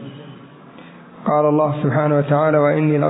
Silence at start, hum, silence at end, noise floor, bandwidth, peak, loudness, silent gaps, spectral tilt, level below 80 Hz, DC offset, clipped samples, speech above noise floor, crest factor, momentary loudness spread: 0 s; none; 0 s; -41 dBFS; 4 kHz; -4 dBFS; -17 LUFS; none; -12.5 dB/octave; -62 dBFS; under 0.1%; under 0.1%; 25 dB; 14 dB; 12 LU